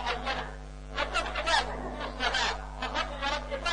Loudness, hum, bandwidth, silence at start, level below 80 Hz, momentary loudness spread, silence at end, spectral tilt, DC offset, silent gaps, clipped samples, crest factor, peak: -31 LUFS; none; 10 kHz; 0 s; -42 dBFS; 9 LU; 0 s; -3 dB/octave; under 0.1%; none; under 0.1%; 20 dB; -12 dBFS